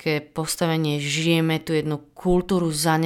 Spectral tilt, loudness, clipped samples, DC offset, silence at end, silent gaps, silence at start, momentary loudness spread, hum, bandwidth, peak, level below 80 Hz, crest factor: -5 dB/octave; -23 LUFS; under 0.1%; under 0.1%; 0 s; none; 0 s; 6 LU; none; 17.5 kHz; -8 dBFS; -44 dBFS; 14 dB